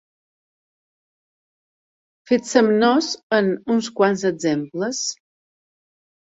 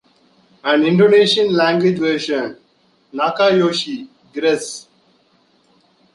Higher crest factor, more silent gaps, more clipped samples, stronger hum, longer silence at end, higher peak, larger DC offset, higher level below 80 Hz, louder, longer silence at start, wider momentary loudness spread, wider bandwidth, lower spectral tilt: first, 22 dB vs 16 dB; first, 3.23-3.30 s vs none; neither; neither; second, 1.1 s vs 1.35 s; about the same, -2 dBFS vs -2 dBFS; neither; about the same, -68 dBFS vs -64 dBFS; second, -20 LUFS vs -16 LUFS; first, 2.3 s vs 0.65 s; second, 9 LU vs 18 LU; second, 8 kHz vs 11.5 kHz; about the same, -4 dB/octave vs -5 dB/octave